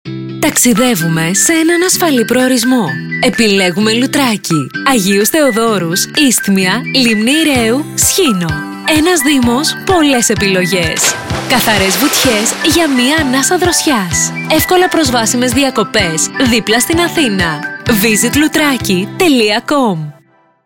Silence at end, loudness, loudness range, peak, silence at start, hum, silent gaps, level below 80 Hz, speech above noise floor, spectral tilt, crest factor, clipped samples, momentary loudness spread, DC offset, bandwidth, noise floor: 0.55 s; -10 LUFS; 1 LU; 0 dBFS; 0.05 s; none; none; -36 dBFS; 37 dB; -3 dB/octave; 12 dB; under 0.1%; 4 LU; 0.2%; 17 kHz; -48 dBFS